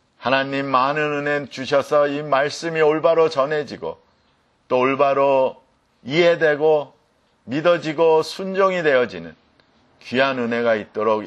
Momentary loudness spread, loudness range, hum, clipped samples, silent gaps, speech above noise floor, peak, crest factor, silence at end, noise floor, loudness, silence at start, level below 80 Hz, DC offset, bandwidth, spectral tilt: 8 LU; 2 LU; none; under 0.1%; none; 43 dB; -2 dBFS; 18 dB; 0 s; -62 dBFS; -19 LUFS; 0.2 s; -66 dBFS; under 0.1%; 11.5 kHz; -5.5 dB/octave